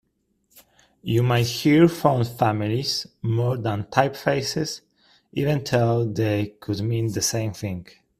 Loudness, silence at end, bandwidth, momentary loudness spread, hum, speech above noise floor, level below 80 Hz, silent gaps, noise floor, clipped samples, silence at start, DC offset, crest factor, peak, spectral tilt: -23 LUFS; 0.35 s; 15 kHz; 11 LU; none; 48 dB; -56 dBFS; none; -70 dBFS; under 0.1%; 0.55 s; under 0.1%; 22 dB; 0 dBFS; -5.5 dB/octave